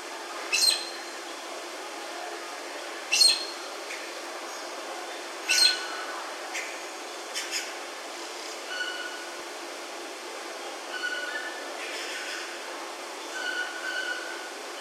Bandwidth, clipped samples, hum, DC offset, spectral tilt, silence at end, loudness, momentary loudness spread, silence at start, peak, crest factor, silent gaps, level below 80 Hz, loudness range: 16 kHz; under 0.1%; none; under 0.1%; 3.5 dB/octave; 0 s; -29 LUFS; 15 LU; 0 s; -8 dBFS; 24 dB; none; under -90 dBFS; 9 LU